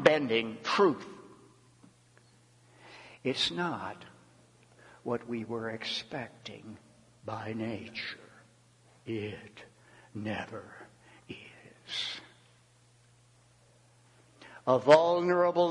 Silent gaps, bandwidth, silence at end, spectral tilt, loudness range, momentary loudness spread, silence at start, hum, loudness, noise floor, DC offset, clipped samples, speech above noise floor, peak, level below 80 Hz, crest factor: none; 11.5 kHz; 0 s; -5 dB/octave; 12 LU; 25 LU; 0 s; none; -31 LUFS; -63 dBFS; under 0.1%; under 0.1%; 33 dB; -6 dBFS; -74 dBFS; 28 dB